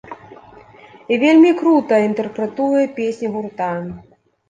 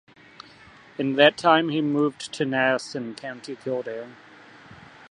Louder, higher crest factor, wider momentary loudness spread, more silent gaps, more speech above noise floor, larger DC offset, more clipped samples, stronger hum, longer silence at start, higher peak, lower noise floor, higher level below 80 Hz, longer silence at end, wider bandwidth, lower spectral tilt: first, -16 LUFS vs -23 LUFS; second, 14 dB vs 24 dB; about the same, 15 LU vs 17 LU; neither; about the same, 28 dB vs 27 dB; neither; neither; neither; second, 0.05 s vs 1 s; about the same, -2 dBFS vs -2 dBFS; second, -43 dBFS vs -50 dBFS; first, -58 dBFS vs -70 dBFS; first, 0.5 s vs 0.35 s; second, 9 kHz vs 11 kHz; first, -6.5 dB/octave vs -5 dB/octave